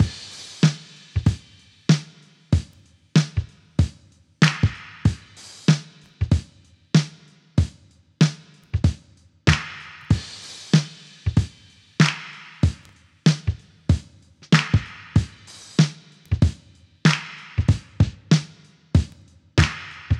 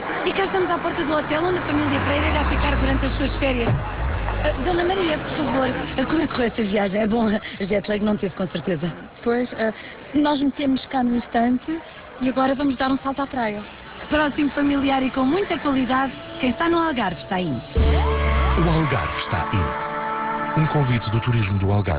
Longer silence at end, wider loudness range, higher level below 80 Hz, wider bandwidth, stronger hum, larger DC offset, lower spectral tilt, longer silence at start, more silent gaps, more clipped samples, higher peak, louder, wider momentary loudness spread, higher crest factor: about the same, 0 s vs 0 s; about the same, 2 LU vs 2 LU; second, -36 dBFS vs -30 dBFS; first, 11 kHz vs 4 kHz; neither; neither; second, -5.5 dB/octave vs -10.5 dB/octave; about the same, 0 s vs 0 s; neither; neither; first, 0 dBFS vs -8 dBFS; about the same, -23 LUFS vs -22 LUFS; first, 15 LU vs 6 LU; first, 22 dB vs 14 dB